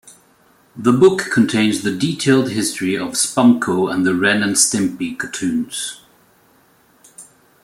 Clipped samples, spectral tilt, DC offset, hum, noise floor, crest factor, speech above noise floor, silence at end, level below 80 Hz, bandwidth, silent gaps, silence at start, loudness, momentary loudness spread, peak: under 0.1%; -4 dB/octave; under 0.1%; none; -54 dBFS; 18 dB; 38 dB; 0.4 s; -58 dBFS; 15.5 kHz; none; 0.05 s; -16 LUFS; 9 LU; 0 dBFS